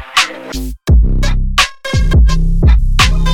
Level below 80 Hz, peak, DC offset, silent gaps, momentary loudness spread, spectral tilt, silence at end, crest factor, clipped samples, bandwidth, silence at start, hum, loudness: -12 dBFS; 0 dBFS; under 0.1%; none; 6 LU; -4 dB/octave; 0 s; 10 dB; under 0.1%; 15 kHz; 0 s; none; -13 LUFS